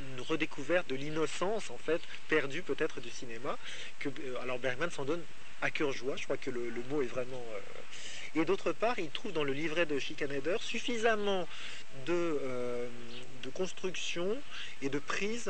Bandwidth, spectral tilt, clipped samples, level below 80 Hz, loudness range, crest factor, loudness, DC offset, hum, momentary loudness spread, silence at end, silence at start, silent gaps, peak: 9 kHz; -4 dB/octave; under 0.1%; -68 dBFS; 4 LU; 20 dB; -36 LUFS; 2%; none; 11 LU; 0 s; 0 s; none; -16 dBFS